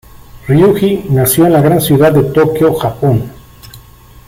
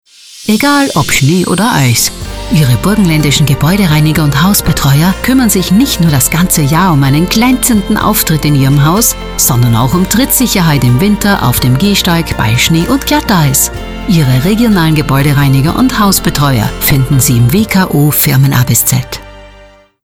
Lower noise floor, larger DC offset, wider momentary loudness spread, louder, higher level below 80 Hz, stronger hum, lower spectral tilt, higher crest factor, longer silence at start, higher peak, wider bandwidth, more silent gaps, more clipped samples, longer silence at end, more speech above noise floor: about the same, -38 dBFS vs -38 dBFS; second, under 0.1% vs 0.7%; first, 6 LU vs 3 LU; about the same, -10 LUFS vs -9 LUFS; second, -38 dBFS vs -24 dBFS; neither; first, -6.5 dB/octave vs -4.5 dB/octave; about the same, 10 dB vs 8 dB; about the same, 0.35 s vs 0.3 s; about the same, 0 dBFS vs 0 dBFS; second, 16.5 kHz vs 19 kHz; neither; neither; about the same, 0.5 s vs 0.55 s; about the same, 28 dB vs 30 dB